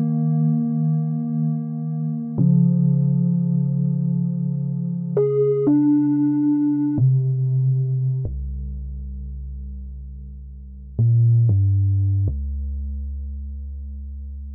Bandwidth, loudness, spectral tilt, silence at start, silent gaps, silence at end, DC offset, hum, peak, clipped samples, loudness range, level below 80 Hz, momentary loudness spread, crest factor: 2.2 kHz; -20 LUFS; -15.5 dB/octave; 0 s; none; 0 s; under 0.1%; none; -8 dBFS; under 0.1%; 6 LU; -34 dBFS; 17 LU; 12 dB